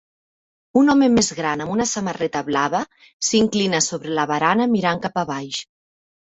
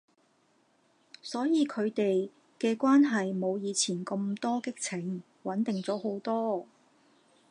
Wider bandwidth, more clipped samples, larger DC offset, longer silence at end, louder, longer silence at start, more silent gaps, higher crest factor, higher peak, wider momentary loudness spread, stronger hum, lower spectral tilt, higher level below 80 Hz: second, 8.2 kHz vs 11 kHz; neither; neither; second, 0.7 s vs 0.85 s; first, -20 LUFS vs -30 LUFS; second, 0.75 s vs 1.25 s; first, 3.13-3.20 s vs none; about the same, 16 dB vs 16 dB; first, -4 dBFS vs -14 dBFS; about the same, 10 LU vs 12 LU; neither; about the same, -3.5 dB/octave vs -4.5 dB/octave; first, -54 dBFS vs -84 dBFS